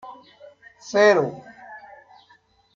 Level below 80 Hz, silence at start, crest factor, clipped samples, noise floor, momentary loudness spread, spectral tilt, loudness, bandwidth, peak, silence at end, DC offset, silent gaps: -68 dBFS; 0.05 s; 20 dB; under 0.1%; -59 dBFS; 26 LU; -4.5 dB/octave; -19 LUFS; 7.4 kHz; -4 dBFS; 1 s; under 0.1%; none